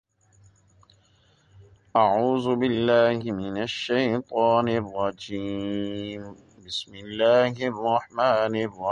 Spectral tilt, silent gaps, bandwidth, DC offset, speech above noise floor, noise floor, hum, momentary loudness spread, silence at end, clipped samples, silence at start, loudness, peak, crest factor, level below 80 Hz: -6 dB/octave; none; 9.8 kHz; under 0.1%; 37 dB; -61 dBFS; none; 12 LU; 0 s; under 0.1%; 1.6 s; -24 LUFS; -6 dBFS; 18 dB; -60 dBFS